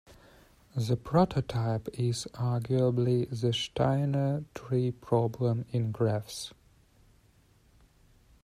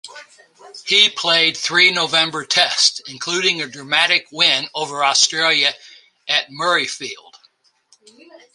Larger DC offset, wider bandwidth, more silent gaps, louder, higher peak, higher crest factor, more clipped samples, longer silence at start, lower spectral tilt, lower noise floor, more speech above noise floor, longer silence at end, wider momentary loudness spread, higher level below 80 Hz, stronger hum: neither; first, 13 kHz vs 11.5 kHz; neither; second, -30 LUFS vs -15 LUFS; second, -10 dBFS vs 0 dBFS; about the same, 20 dB vs 20 dB; neither; about the same, 0.1 s vs 0.05 s; first, -7 dB/octave vs -0.5 dB/octave; first, -63 dBFS vs -58 dBFS; second, 34 dB vs 40 dB; first, 1.95 s vs 1.4 s; second, 8 LU vs 13 LU; first, -56 dBFS vs -70 dBFS; neither